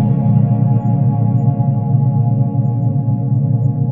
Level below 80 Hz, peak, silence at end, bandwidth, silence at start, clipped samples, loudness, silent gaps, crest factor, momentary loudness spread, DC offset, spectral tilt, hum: -46 dBFS; -2 dBFS; 0 s; 2 kHz; 0 s; under 0.1%; -15 LUFS; none; 12 dB; 3 LU; under 0.1%; -14 dB/octave; none